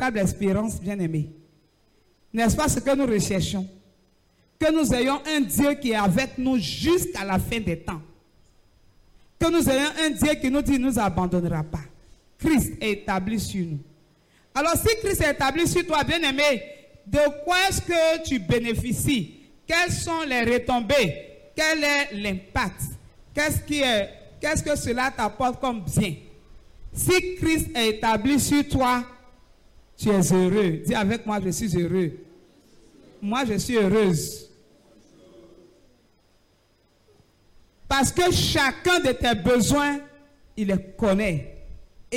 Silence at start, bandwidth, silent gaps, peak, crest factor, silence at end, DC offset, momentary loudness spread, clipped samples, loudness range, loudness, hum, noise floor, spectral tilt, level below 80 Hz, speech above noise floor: 0 s; 16.5 kHz; none; -8 dBFS; 16 dB; 0 s; under 0.1%; 10 LU; under 0.1%; 4 LU; -23 LUFS; none; -63 dBFS; -4.5 dB/octave; -42 dBFS; 40 dB